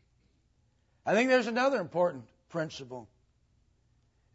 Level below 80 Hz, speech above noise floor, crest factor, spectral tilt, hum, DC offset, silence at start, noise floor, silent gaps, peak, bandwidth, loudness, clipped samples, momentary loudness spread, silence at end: -72 dBFS; 41 dB; 20 dB; -5 dB/octave; none; under 0.1%; 1.05 s; -70 dBFS; none; -14 dBFS; 8 kHz; -29 LUFS; under 0.1%; 20 LU; 1.3 s